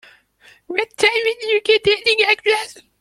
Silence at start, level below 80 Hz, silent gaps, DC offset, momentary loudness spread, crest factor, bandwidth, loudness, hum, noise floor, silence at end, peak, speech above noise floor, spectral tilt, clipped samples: 0.7 s; -58 dBFS; none; under 0.1%; 9 LU; 18 dB; 13 kHz; -16 LUFS; none; -51 dBFS; 0.3 s; 0 dBFS; 34 dB; -1.5 dB/octave; under 0.1%